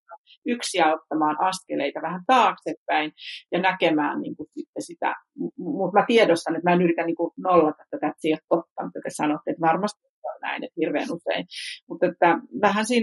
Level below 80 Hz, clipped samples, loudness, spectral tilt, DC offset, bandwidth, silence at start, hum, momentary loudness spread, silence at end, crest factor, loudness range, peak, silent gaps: -72 dBFS; under 0.1%; -24 LUFS; -5 dB/octave; under 0.1%; 11.5 kHz; 0.1 s; none; 14 LU; 0 s; 18 dB; 5 LU; -6 dBFS; 0.18-0.24 s, 0.37-0.42 s, 2.77-2.86 s, 4.68-4.73 s, 8.44-8.48 s, 8.71-8.76 s, 10.09-10.22 s, 11.83-11.87 s